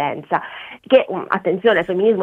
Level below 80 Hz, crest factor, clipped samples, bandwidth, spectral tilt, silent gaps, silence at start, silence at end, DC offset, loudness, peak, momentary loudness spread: -60 dBFS; 18 dB; under 0.1%; 4.5 kHz; -7.5 dB/octave; none; 0 s; 0 s; under 0.1%; -18 LUFS; 0 dBFS; 9 LU